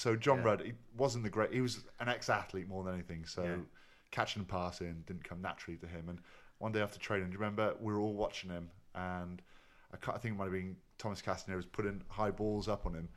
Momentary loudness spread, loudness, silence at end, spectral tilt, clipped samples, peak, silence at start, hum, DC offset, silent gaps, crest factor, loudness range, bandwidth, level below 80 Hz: 12 LU; -39 LUFS; 0 s; -5.5 dB/octave; under 0.1%; -16 dBFS; 0 s; none; under 0.1%; none; 24 dB; 5 LU; 13.5 kHz; -56 dBFS